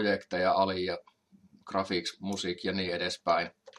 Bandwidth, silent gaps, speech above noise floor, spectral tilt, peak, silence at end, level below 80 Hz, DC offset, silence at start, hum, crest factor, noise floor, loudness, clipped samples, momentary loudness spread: 12.5 kHz; none; 31 dB; -4.5 dB/octave; -12 dBFS; 0.1 s; -74 dBFS; under 0.1%; 0 s; none; 20 dB; -62 dBFS; -31 LUFS; under 0.1%; 8 LU